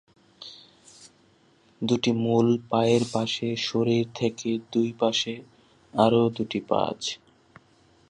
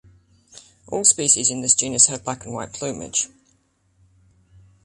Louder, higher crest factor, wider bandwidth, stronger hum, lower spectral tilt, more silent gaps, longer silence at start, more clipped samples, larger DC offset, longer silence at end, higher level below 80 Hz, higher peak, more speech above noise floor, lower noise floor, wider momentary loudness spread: second, -25 LUFS vs -18 LUFS; about the same, 22 dB vs 24 dB; about the same, 10.5 kHz vs 11.5 kHz; neither; first, -5.5 dB/octave vs -1.5 dB/octave; neither; second, 0.4 s vs 0.55 s; neither; neither; second, 0.95 s vs 1.6 s; second, -64 dBFS vs -58 dBFS; second, -6 dBFS vs 0 dBFS; second, 36 dB vs 42 dB; about the same, -60 dBFS vs -63 dBFS; about the same, 13 LU vs 15 LU